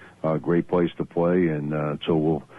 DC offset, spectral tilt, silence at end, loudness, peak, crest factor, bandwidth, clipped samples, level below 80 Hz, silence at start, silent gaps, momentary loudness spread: under 0.1%; -9.5 dB/octave; 0 s; -24 LUFS; -10 dBFS; 14 dB; 4.3 kHz; under 0.1%; -54 dBFS; 0 s; none; 5 LU